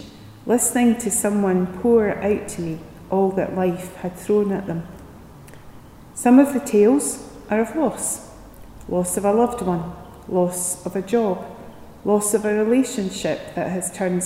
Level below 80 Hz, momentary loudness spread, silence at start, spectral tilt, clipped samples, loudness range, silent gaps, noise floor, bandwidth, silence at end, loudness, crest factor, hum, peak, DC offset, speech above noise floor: -50 dBFS; 14 LU; 0 s; -5.5 dB/octave; under 0.1%; 4 LU; none; -42 dBFS; 16 kHz; 0 s; -21 LUFS; 18 dB; none; -2 dBFS; under 0.1%; 22 dB